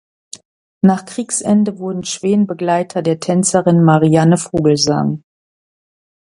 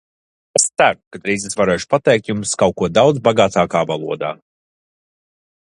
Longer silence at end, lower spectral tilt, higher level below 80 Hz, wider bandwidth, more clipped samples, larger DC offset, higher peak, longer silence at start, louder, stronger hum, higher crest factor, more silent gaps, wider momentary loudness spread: second, 1.05 s vs 1.45 s; first, -5.5 dB/octave vs -4 dB/octave; about the same, -52 dBFS vs -50 dBFS; about the same, 11.5 kHz vs 11.5 kHz; neither; neither; about the same, 0 dBFS vs 0 dBFS; second, 0.35 s vs 0.55 s; about the same, -15 LUFS vs -16 LUFS; neither; about the same, 16 dB vs 18 dB; first, 0.45-0.81 s vs 1.07-1.11 s; about the same, 9 LU vs 10 LU